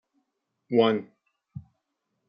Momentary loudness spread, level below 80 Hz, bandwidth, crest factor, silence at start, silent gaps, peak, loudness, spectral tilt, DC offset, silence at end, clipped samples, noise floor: 23 LU; -74 dBFS; 5.4 kHz; 22 dB; 0.7 s; none; -8 dBFS; -25 LUFS; -4.5 dB/octave; under 0.1%; 0.7 s; under 0.1%; -79 dBFS